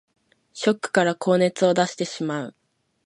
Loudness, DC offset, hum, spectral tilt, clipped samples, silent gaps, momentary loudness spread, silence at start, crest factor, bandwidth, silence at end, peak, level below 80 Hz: -22 LUFS; under 0.1%; none; -5 dB/octave; under 0.1%; none; 9 LU; 0.55 s; 20 dB; 11.5 kHz; 0.55 s; -4 dBFS; -70 dBFS